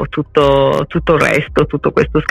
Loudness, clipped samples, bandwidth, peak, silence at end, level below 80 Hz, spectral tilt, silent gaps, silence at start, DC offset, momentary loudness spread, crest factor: -13 LUFS; under 0.1%; 14.5 kHz; 0 dBFS; 0 s; -30 dBFS; -6.5 dB/octave; none; 0 s; under 0.1%; 5 LU; 12 dB